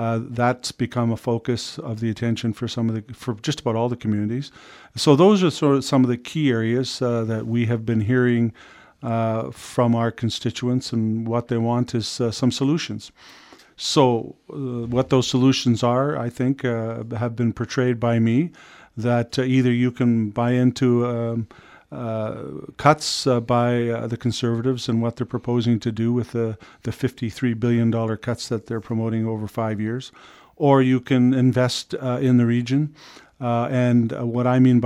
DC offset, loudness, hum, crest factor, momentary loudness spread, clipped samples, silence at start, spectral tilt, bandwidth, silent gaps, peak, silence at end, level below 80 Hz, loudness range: under 0.1%; -22 LUFS; none; 22 dB; 10 LU; under 0.1%; 0 s; -6.5 dB/octave; 12 kHz; none; 0 dBFS; 0 s; -56 dBFS; 4 LU